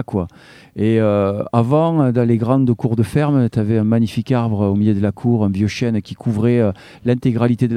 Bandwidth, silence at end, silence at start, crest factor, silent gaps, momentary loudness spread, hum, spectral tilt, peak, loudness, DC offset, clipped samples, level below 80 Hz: 11 kHz; 0 s; 0 s; 16 dB; none; 6 LU; none; -8.5 dB/octave; 0 dBFS; -17 LUFS; under 0.1%; under 0.1%; -50 dBFS